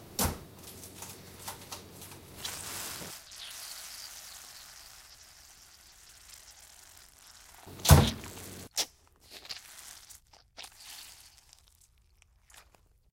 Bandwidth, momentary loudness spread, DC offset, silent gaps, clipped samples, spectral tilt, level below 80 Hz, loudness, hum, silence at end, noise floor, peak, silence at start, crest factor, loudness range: 17 kHz; 21 LU; under 0.1%; none; under 0.1%; -4 dB/octave; -44 dBFS; -33 LUFS; none; 0.5 s; -65 dBFS; -2 dBFS; 0 s; 34 dB; 20 LU